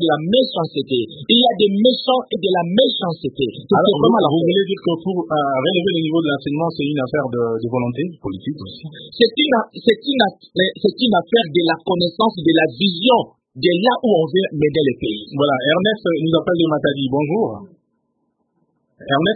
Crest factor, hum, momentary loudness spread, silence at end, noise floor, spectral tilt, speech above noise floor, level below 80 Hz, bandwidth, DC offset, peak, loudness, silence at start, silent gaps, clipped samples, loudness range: 18 dB; none; 8 LU; 0 s; -68 dBFS; -9 dB/octave; 51 dB; -56 dBFS; 4.8 kHz; under 0.1%; 0 dBFS; -17 LUFS; 0 s; none; under 0.1%; 4 LU